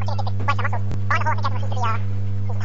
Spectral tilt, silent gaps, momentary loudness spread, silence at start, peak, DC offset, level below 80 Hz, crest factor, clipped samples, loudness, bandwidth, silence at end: -6.5 dB/octave; none; 5 LU; 0 s; -6 dBFS; 8%; -48 dBFS; 16 dB; under 0.1%; -24 LUFS; 7.2 kHz; 0 s